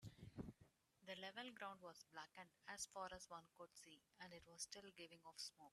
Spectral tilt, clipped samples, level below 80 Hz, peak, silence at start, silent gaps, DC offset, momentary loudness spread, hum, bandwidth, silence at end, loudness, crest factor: -2.5 dB/octave; under 0.1%; -80 dBFS; -38 dBFS; 0 s; none; under 0.1%; 10 LU; none; 13 kHz; 0.05 s; -57 LUFS; 22 dB